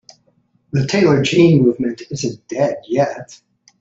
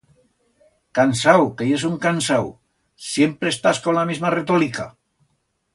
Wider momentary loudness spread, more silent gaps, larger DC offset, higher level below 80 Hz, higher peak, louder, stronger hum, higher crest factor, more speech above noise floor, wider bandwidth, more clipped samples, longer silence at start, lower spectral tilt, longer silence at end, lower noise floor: about the same, 12 LU vs 11 LU; neither; neither; about the same, -54 dBFS vs -58 dBFS; about the same, -2 dBFS vs 0 dBFS; first, -16 LUFS vs -19 LUFS; neither; about the same, 16 dB vs 20 dB; second, 44 dB vs 50 dB; second, 8 kHz vs 11.5 kHz; neither; second, 0.75 s vs 0.95 s; first, -6.5 dB/octave vs -5 dB/octave; second, 0.45 s vs 0.85 s; second, -60 dBFS vs -69 dBFS